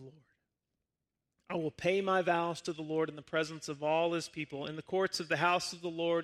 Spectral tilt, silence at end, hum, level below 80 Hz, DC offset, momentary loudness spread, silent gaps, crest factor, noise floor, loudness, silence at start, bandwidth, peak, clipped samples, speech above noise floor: -4.5 dB/octave; 0 s; none; -74 dBFS; under 0.1%; 10 LU; none; 20 dB; -88 dBFS; -34 LUFS; 0 s; 14 kHz; -14 dBFS; under 0.1%; 55 dB